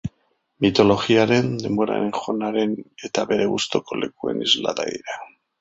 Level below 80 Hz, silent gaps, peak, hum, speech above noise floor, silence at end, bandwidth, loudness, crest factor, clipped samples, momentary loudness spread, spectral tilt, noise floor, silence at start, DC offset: -54 dBFS; none; -2 dBFS; none; 46 dB; 0.3 s; 8 kHz; -21 LUFS; 20 dB; under 0.1%; 12 LU; -5 dB/octave; -67 dBFS; 0.05 s; under 0.1%